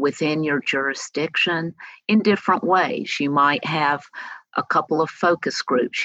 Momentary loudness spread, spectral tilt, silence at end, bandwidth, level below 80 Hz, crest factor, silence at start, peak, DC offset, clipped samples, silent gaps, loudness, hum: 9 LU; -4.5 dB/octave; 0 s; 8.4 kHz; -74 dBFS; 16 dB; 0 s; -6 dBFS; under 0.1%; under 0.1%; none; -21 LUFS; none